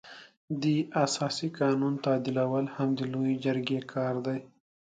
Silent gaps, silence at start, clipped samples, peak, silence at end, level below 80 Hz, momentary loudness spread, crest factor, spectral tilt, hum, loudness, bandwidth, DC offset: 0.37-0.48 s; 0.05 s; under 0.1%; -12 dBFS; 0.4 s; -74 dBFS; 7 LU; 18 dB; -6 dB/octave; none; -30 LUFS; 9.4 kHz; under 0.1%